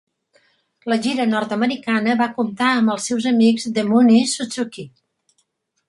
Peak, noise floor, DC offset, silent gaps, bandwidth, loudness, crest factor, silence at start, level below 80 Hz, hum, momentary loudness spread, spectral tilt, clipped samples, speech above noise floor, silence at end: -4 dBFS; -68 dBFS; under 0.1%; none; 11.5 kHz; -18 LUFS; 16 dB; 0.85 s; -64 dBFS; none; 12 LU; -4.5 dB/octave; under 0.1%; 50 dB; 1 s